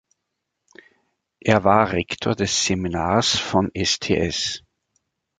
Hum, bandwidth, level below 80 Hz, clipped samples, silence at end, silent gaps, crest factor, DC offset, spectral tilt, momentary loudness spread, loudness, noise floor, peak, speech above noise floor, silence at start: none; 9.6 kHz; -44 dBFS; under 0.1%; 0.8 s; none; 22 dB; under 0.1%; -4 dB/octave; 7 LU; -20 LUFS; -79 dBFS; 0 dBFS; 59 dB; 1.45 s